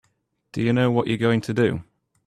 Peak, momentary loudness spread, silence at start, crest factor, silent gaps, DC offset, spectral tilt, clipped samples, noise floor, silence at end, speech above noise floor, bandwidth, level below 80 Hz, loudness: -6 dBFS; 10 LU; 0.55 s; 16 dB; none; under 0.1%; -7.5 dB/octave; under 0.1%; -70 dBFS; 0.45 s; 49 dB; 12 kHz; -56 dBFS; -22 LUFS